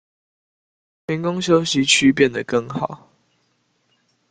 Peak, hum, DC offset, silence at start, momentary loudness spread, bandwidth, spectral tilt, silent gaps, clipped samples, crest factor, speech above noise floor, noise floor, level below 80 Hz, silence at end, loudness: -2 dBFS; none; under 0.1%; 1.1 s; 15 LU; 9.4 kHz; -4 dB/octave; none; under 0.1%; 20 dB; 48 dB; -66 dBFS; -58 dBFS; 1.35 s; -18 LUFS